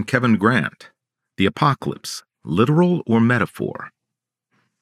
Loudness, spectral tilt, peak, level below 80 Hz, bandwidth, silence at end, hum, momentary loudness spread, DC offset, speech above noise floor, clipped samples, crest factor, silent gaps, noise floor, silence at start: -19 LUFS; -6.5 dB/octave; 0 dBFS; -60 dBFS; 14 kHz; 0.95 s; none; 14 LU; under 0.1%; 65 dB; under 0.1%; 20 dB; none; -83 dBFS; 0 s